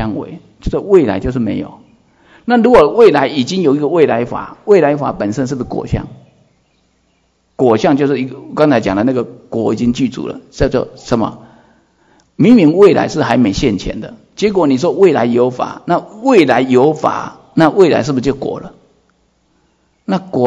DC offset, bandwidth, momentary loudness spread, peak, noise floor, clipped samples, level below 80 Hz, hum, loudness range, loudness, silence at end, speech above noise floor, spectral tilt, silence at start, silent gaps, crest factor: under 0.1%; 8.2 kHz; 14 LU; 0 dBFS; -58 dBFS; 0.6%; -38 dBFS; none; 6 LU; -13 LUFS; 0 s; 46 dB; -6.5 dB/octave; 0 s; none; 14 dB